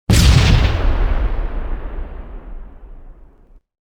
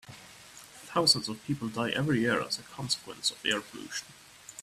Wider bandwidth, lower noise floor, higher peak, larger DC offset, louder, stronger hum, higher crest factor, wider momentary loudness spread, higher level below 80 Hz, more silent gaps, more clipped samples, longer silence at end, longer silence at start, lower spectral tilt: about the same, 16.5 kHz vs 15.5 kHz; second, -46 dBFS vs -51 dBFS; first, 0 dBFS vs -8 dBFS; neither; first, -16 LUFS vs -30 LUFS; neither; second, 16 dB vs 24 dB; about the same, 25 LU vs 24 LU; first, -18 dBFS vs -66 dBFS; neither; neither; first, 0.75 s vs 0 s; about the same, 0.1 s vs 0.05 s; first, -5 dB/octave vs -3.5 dB/octave